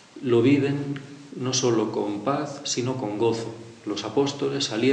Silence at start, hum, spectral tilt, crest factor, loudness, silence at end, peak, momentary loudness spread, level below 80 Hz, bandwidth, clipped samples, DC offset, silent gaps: 0.15 s; none; -5 dB/octave; 16 dB; -25 LUFS; 0 s; -8 dBFS; 12 LU; -70 dBFS; 9.8 kHz; under 0.1%; under 0.1%; none